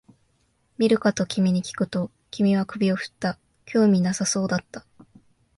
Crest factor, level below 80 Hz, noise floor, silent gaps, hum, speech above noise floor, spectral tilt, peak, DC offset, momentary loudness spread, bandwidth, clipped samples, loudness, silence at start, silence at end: 16 dB; -62 dBFS; -67 dBFS; none; none; 45 dB; -5.5 dB/octave; -8 dBFS; under 0.1%; 10 LU; 11.5 kHz; under 0.1%; -23 LUFS; 0.8 s; 0.8 s